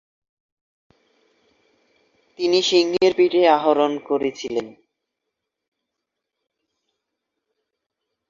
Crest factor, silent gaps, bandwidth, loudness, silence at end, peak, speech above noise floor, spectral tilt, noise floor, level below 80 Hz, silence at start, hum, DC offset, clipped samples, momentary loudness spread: 20 dB; none; 7.6 kHz; -19 LUFS; 3.6 s; -4 dBFS; 63 dB; -3.5 dB/octave; -82 dBFS; -68 dBFS; 2.4 s; none; under 0.1%; under 0.1%; 11 LU